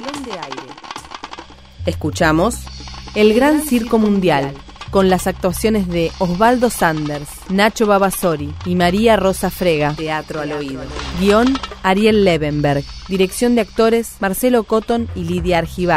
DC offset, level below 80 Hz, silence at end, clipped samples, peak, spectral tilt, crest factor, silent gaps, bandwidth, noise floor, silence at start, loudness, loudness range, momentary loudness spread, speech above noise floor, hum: 0.1%; -34 dBFS; 0 s; under 0.1%; 0 dBFS; -5.5 dB/octave; 16 dB; none; 16 kHz; -36 dBFS; 0 s; -16 LUFS; 2 LU; 14 LU; 20 dB; none